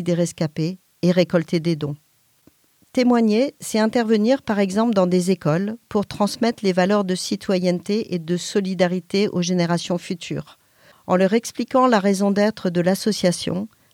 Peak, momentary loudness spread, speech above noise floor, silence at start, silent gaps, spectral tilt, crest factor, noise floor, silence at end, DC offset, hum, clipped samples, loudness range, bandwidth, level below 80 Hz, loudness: -2 dBFS; 8 LU; 38 dB; 0 s; none; -6 dB/octave; 18 dB; -58 dBFS; 0.25 s; under 0.1%; none; under 0.1%; 3 LU; 16 kHz; -62 dBFS; -21 LUFS